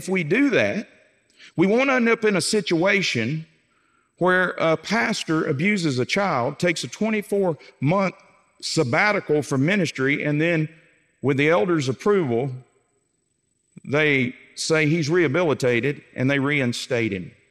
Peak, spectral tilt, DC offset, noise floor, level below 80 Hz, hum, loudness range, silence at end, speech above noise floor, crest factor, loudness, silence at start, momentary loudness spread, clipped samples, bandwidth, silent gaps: -6 dBFS; -5 dB/octave; under 0.1%; -71 dBFS; -70 dBFS; none; 2 LU; 0.2 s; 49 dB; 18 dB; -21 LUFS; 0 s; 8 LU; under 0.1%; 14 kHz; none